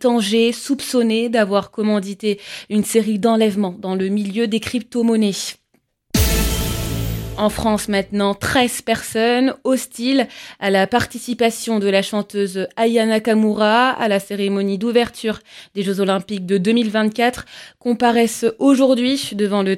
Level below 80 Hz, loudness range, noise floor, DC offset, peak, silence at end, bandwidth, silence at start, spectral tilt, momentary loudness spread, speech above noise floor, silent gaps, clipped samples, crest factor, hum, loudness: -34 dBFS; 3 LU; -64 dBFS; under 0.1%; -2 dBFS; 0 s; 17 kHz; 0 s; -4.5 dB/octave; 8 LU; 47 dB; none; under 0.1%; 16 dB; none; -18 LUFS